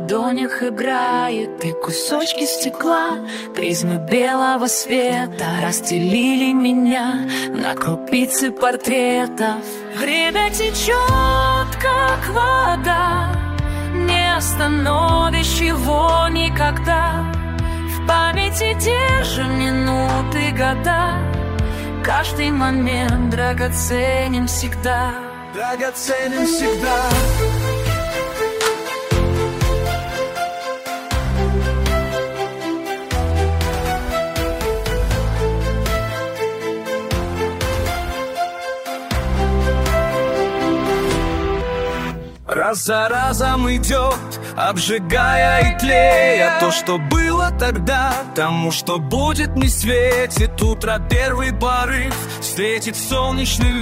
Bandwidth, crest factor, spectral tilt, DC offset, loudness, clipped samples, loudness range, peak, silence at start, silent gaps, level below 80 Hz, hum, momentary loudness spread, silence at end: 16 kHz; 18 dB; -4.5 dB/octave; under 0.1%; -18 LUFS; under 0.1%; 5 LU; 0 dBFS; 0 s; none; -26 dBFS; none; 8 LU; 0 s